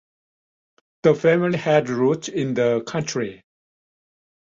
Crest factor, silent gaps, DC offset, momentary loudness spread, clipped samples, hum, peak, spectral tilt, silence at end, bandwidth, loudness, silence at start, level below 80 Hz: 18 dB; none; under 0.1%; 8 LU; under 0.1%; none; -4 dBFS; -6 dB/octave; 1.25 s; 7.8 kHz; -21 LUFS; 1.05 s; -62 dBFS